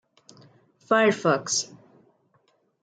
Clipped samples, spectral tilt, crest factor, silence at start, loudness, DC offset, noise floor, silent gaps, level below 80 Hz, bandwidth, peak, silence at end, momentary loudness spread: under 0.1%; -3 dB/octave; 20 dB; 0.9 s; -23 LUFS; under 0.1%; -67 dBFS; none; -78 dBFS; 10 kHz; -8 dBFS; 1.2 s; 6 LU